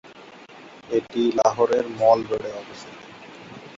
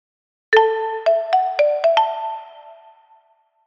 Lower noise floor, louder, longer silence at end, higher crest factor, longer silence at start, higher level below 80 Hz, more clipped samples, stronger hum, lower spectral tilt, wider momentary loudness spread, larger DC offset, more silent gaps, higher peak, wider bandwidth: second, -45 dBFS vs -59 dBFS; second, -22 LUFS vs -18 LUFS; second, 0 s vs 0.95 s; about the same, 20 dB vs 20 dB; second, 0.1 s vs 0.5 s; first, -62 dBFS vs -76 dBFS; neither; neither; first, -5 dB/octave vs -0.5 dB/octave; first, 25 LU vs 11 LU; neither; neither; second, -4 dBFS vs 0 dBFS; about the same, 7.8 kHz vs 7.4 kHz